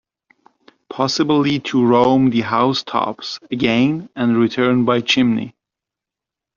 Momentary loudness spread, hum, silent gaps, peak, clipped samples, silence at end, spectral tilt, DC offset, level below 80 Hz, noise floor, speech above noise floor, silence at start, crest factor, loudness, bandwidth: 10 LU; none; none; -2 dBFS; under 0.1%; 1.05 s; -4 dB/octave; under 0.1%; -56 dBFS; -86 dBFS; 69 dB; 0.9 s; 16 dB; -17 LUFS; 7.4 kHz